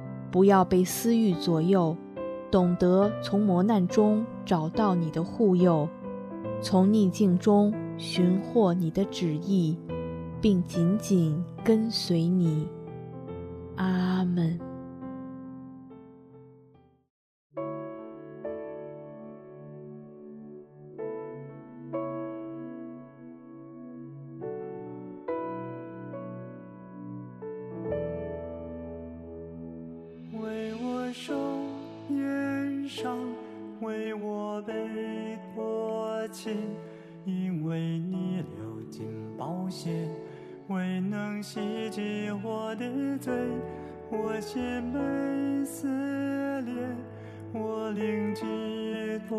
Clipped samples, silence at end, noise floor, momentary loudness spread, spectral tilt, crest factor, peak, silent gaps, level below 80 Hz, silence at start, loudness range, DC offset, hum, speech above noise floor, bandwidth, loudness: under 0.1%; 0 s; -59 dBFS; 20 LU; -7 dB/octave; 20 dB; -8 dBFS; 17.10-17.50 s; -60 dBFS; 0 s; 16 LU; under 0.1%; none; 35 dB; 13.5 kHz; -29 LUFS